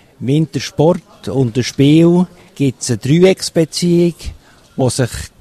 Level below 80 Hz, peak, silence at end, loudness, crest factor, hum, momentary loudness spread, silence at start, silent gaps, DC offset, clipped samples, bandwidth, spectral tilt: -40 dBFS; 0 dBFS; 0.15 s; -14 LUFS; 14 dB; none; 11 LU; 0.2 s; none; under 0.1%; under 0.1%; 13.5 kHz; -6 dB/octave